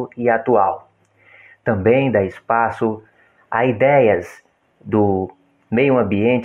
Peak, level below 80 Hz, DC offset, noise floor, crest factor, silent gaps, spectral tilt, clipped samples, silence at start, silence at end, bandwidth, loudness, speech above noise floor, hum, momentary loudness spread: -4 dBFS; -56 dBFS; under 0.1%; -52 dBFS; 14 dB; none; -8.5 dB/octave; under 0.1%; 0 s; 0 s; 7.2 kHz; -17 LUFS; 35 dB; none; 10 LU